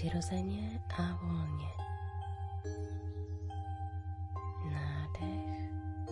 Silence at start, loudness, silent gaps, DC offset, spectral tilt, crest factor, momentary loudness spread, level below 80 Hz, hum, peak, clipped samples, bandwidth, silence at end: 0 s; -40 LUFS; none; under 0.1%; -7 dB/octave; 14 dB; 5 LU; -54 dBFS; none; -24 dBFS; under 0.1%; 11 kHz; 0 s